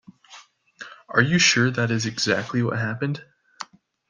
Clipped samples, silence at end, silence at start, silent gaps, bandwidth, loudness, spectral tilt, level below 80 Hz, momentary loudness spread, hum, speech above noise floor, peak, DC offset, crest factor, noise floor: under 0.1%; 0.45 s; 0.3 s; none; 10 kHz; -21 LUFS; -4 dB/octave; -62 dBFS; 23 LU; none; 28 dB; -2 dBFS; under 0.1%; 22 dB; -49 dBFS